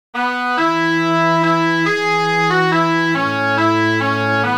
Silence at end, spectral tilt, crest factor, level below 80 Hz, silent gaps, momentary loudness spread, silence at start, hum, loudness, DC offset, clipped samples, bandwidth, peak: 0 s; -5.5 dB/octave; 12 dB; -62 dBFS; none; 2 LU; 0.15 s; none; -15 LUFS; under 0.1%; under 0.1%; 16.5 kHz; -2 dBFS